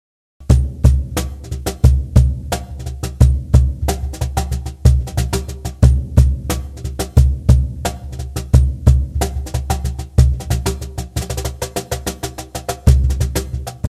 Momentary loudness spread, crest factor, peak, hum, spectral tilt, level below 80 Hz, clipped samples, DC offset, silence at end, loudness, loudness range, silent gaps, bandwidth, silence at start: 12 LU; 16 dB; 0 dBFS; none; -6 dB/octave; -18 dBFS; under 0.1%; under 0.1%; 0 s; -18 LUFS; 4 LU; none; 14.5 kHz; 0.4 s